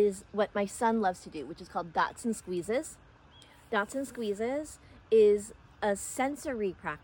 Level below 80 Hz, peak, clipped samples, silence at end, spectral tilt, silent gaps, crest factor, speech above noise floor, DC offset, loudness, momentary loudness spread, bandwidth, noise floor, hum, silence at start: -62 dBFS; -14 dBFS; under 0.1%; 0.05 s; -4.5 dB/octave; none; 16 dB; 26 dB; under 0.1%; -31 LUFS; 15 LU; 17.5 kHz; -57 dBFS; none; 0 s